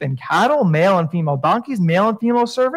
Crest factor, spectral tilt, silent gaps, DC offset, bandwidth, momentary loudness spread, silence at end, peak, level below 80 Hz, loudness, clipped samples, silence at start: 12 dB; -7 dB/octave; none; under 0.1%; 14 kHz; 4 LU; 0 s; -4 dBFS; -68 dBFS; -17 LUFS; under 0.1%; 0 s